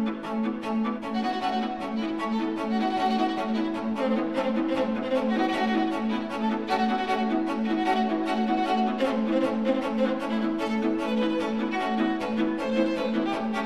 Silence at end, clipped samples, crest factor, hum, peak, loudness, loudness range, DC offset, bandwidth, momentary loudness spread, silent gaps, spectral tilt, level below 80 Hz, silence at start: 0 s; under 0.1%; 14 dB; none; -12 dBFS; -27 LUFS; 2 LU; 0.3%; 11.5 kHz; 4 LU; none; -6 dB/octave; -60 dBFS; 0 s